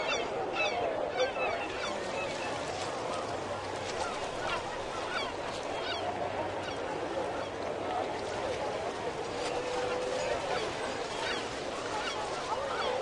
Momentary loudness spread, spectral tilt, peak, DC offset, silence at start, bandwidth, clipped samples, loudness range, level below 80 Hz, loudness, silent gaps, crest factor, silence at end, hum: 4 LU; -3.5 dB/octave; -18 dBFS; under 0.1%; 0 s; 11.5 kHz; under 0.1%; 2 LU; -58 dBFS; -34 LUFS; none; 18 dB; 0 s; none